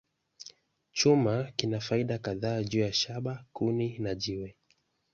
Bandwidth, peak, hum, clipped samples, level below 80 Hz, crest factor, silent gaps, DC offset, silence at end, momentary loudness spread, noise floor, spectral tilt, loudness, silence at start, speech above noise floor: 7.6 kHz; -8 dBFS; none; under 0.1%; -60 dBFS; 24 dB; none; under 0.1%; 0.65 s; 19 LU; -72 dBFS; -5 dB/octave; -30 LUFS; 0.4 s; 42 dB